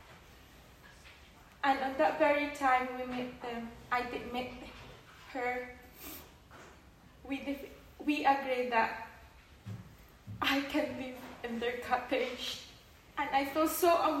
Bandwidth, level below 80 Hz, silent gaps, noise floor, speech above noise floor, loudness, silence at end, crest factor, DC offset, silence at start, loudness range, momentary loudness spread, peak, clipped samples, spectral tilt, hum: 16 kHz; -62 dBFS; none; -58 dBFS; 25 dB; -33 LUFS; 0 s; 20 dB; under 0.1%; 0 s; 9 LU; 23 LU; -16 dBFS; under 0.1%; -4 dB/octave; none